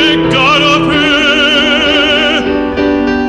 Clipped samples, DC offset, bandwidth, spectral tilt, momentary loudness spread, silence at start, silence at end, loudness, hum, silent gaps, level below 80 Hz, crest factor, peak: under 0.1%; under 0.1%; 11.5 kHz; -4 dB/octave; 5 LU; 0 s; 0 s; -8 LUFS; none; none; -32 dBFS; 10 dB; 0 dBFS